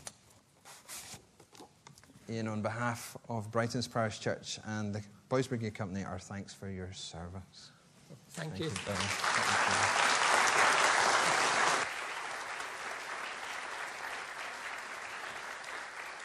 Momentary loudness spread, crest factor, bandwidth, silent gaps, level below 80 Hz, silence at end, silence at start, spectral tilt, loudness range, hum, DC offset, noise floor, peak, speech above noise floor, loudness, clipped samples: 18 LU; 22 dB; 14.5 kHz; none; -70 dBFS; 0 s; 0 s; -2.5 dB/octave; 13 LU; none; under 0.1%; -63 dBFS; -12 dBFS; 28 dB; -33 LUFS; under 0.1%